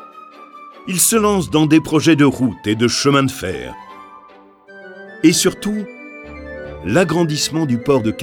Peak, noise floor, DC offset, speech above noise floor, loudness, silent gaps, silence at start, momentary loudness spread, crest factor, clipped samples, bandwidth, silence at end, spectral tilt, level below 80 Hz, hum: 0 dBFS; -45 dBFS; under 0.1%; 29 dB; -15 LUFS; none; 0 s; 20 LU; 18 dB; under 0.1%; 19 kHz; 0 s; -4.5 dB/octave; -44 dBFS; none